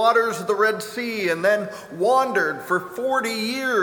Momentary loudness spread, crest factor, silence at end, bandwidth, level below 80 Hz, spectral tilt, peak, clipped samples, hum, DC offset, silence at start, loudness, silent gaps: 6 LU; 16 dB; 0 s; over 20 kHz; -70 dBFS; -3.5 dB/octave; -4 dBFS; under 0.1%; none; under 0.1%; 0 s; -22 LUFS; none